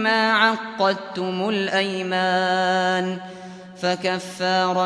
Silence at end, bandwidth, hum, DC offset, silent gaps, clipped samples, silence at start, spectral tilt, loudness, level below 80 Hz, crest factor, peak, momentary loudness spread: 0 s; 11 kHz; none; under 0.1%; none; under 0.1%; 0 s; -4.5 dB/octave; -21 LUFS; -70 dBFS; 18 dB; -4 dBFS; 10 LU